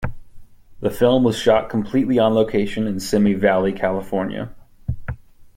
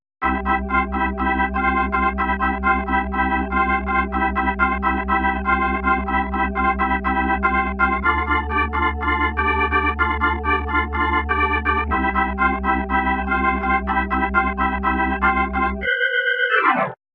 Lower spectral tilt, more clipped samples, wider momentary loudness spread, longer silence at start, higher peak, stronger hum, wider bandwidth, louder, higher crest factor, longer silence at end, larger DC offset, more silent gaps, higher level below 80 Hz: second, -6.5 dB/octave vs -8 dB/octave; neither; first, 15 LU vs 3 LU; second, 0 s vs 0.2 s; about the same, -2 dBFS vs -4 dBFS; neither; first, 16.5 kHz vs 4.5 kHz; about the same, -19 LUFS vs -19 LUFS; about the same, 16 dB vs 16 dB; about the same, 0.1 s vs 0.2 s; neither; neither; second, -40 dBFS vs -30 dBFS